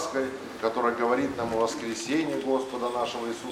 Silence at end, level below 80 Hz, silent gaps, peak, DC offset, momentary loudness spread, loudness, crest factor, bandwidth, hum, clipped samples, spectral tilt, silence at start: 0 s; -60 dBFS; none; -10 dBFS; under 0.1%; 5 LU; -28 LUFS; 18 dB; 16.5 kHz; none; under 0.1%; -4 dB/octave; 0 s